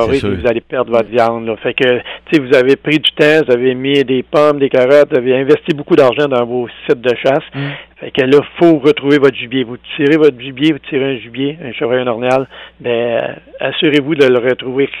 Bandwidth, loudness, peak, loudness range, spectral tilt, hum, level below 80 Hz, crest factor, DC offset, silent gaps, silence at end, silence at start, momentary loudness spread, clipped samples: 10.5 kHz; -13 LUFS; 0 dBFS; 4 LU; -6.5 dB/octave; none; -46 dBFS; 12 dB; under 0.1%; none; 0 s; 0 s; 10 LU; under 0.1%